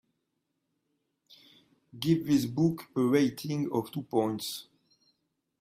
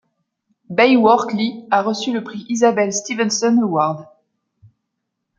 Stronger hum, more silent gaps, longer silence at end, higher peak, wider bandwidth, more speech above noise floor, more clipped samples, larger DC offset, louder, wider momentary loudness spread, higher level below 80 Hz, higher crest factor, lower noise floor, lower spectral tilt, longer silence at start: neither; neither; second, 1 s vs 1.35 s; second, -12 dBFS vs -2 dBFS; first, 16 kHz vs 9 kHz; second, 52 dB vs 60 dB; neither; neither; second, -29 LUFS vs -17 LUFS; about the same, 9 LU vs 11 LU; about the same, -68 dBFS vs -66 dBFS; about the same, 20 dB vs 16 dB; first, -81 dBFS vs -76 dBFS; first, -6.5 dB/octave vs -4 dB/octave; first, 1.95 s vs 0.7 s